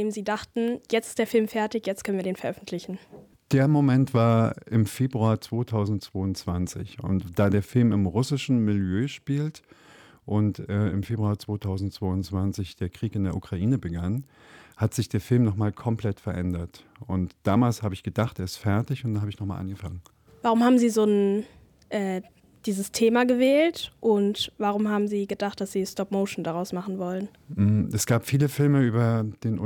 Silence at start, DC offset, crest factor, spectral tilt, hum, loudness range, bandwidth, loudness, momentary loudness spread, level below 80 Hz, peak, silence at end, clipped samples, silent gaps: 0 s; under 0.1%; 16 dB; -6.5 dB/octave; none; 5 LU; 19 kHz; -26 LUFS; 11 LU; -58 dBFS; -10 dBFS; 0 s; under 0.1%; none